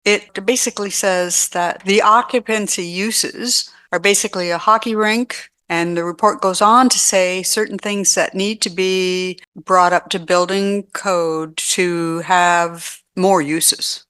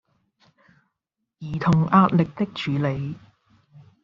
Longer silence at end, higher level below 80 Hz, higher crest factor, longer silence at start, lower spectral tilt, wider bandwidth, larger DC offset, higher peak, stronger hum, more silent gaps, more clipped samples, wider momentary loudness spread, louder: second, 0.1 s vs 0.85 s; second, -64 dBFS vs -56 dBFS; about the same, 16 dB vs 20 dB; second, 0.05 s vs 1.4 s; second, -2.5 dB/octave vs -6.5 dB/octave; first, 13 kHz vs 7.2 kHz; neither; first, 0 dBFS vs -4 dBFS; neither; first, 9.47-9.52 s vs none; neither; second, 8 LU vs 17 LU; first, -16 LUFS vs -22 LUFS